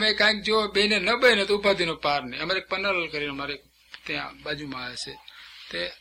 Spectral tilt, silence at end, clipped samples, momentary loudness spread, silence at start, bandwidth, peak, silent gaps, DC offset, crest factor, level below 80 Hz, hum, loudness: -3 dB/octave; 0.05 s; under 0.1%; 17 LU; 0 s; 16 kHz; -4 dBFS; none; under 0.1%; 22 dB; -56 dBFS; none; -24 LUFS